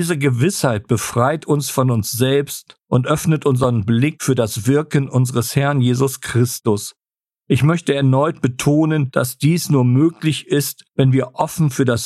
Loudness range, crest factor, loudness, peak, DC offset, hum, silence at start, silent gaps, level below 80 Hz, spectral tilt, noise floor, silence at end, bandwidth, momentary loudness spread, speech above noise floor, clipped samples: 1 LU; 16 dB; -17 LUFS; -2 dBFS; under 0.1%; none; 0 s; none; -52 dBFS; -6 dB/octave; -85 dBFS; 0 s; 14.5 kHz; 4 LU; 69 dB; under 0.1%